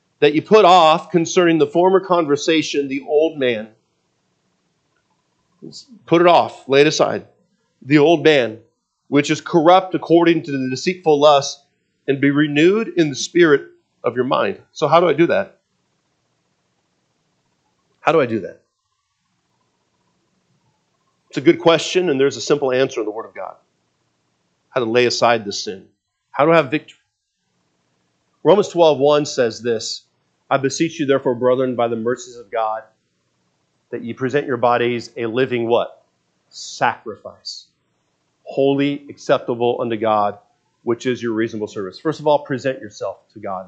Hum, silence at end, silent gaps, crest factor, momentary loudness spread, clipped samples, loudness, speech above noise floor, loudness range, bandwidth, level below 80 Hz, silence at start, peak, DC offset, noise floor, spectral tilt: none; 0.05 s; none; 18 dB; 16 LU; under 0.1%; -17 LUFS; 55 dB; 8 LU; 8.4 kHz; -70 dBFS; 0.2 s; 0 dBFS; under 0.1%; -72 dBFS; -5 dB/octave